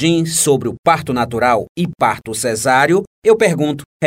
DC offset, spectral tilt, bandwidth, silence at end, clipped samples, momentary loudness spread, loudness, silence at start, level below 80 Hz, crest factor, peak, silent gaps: under 0.1%; -4.5 dB/octave; 16 kHz; 0 s; under 0.1%; 6 LU; -15 LUFS; 0 s; -48 dBFS; 14 dB; 0 dBFS; 0.79-0.83 s, 1.69-1.75 s, 3.07-3.22 s, 3.86-4.00 s